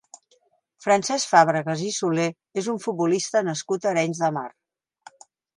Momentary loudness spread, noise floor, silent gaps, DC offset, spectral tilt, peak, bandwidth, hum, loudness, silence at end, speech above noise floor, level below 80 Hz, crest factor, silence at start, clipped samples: 10 LU; -65 dBFS; none; under 0.1%; -4 dB/octave; -2 dBFS; 11.5 kHz; none; -23 LUFS; 1.1 s; 42 dB; -74 dBFS; 22 dB; 0.8 s; under 0.1%